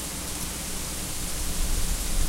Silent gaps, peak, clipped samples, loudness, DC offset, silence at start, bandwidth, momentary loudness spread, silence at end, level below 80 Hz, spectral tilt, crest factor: none; -12 dBFS; under 0.1%; -30 LUFS; under 0.1%; 0 s; 16 kHz; 2 LU; 0 s; -30 dBFS; -2.5 dB/octave; 14 dB